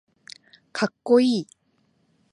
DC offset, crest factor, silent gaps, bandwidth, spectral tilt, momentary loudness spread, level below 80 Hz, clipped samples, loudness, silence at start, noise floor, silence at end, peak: under 0.1%; 20 dB; none; 11 kHz; -5.5 dB/octave; 26 LU; -80 dBFS; under 0.1%; -22 LUFS; 0.75 s; -67 dBFS; 0.9 s; -6 dBFS